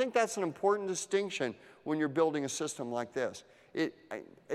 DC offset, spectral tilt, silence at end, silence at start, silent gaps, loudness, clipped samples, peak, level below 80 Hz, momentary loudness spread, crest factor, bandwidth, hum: under 0.1%; -4 dB/octave; 0 s; 0 s; none; -34 LUFS; under 0.1%; -16 dBFS; -80 dBFS; 15 LU; 18 dB; 14 kHz; none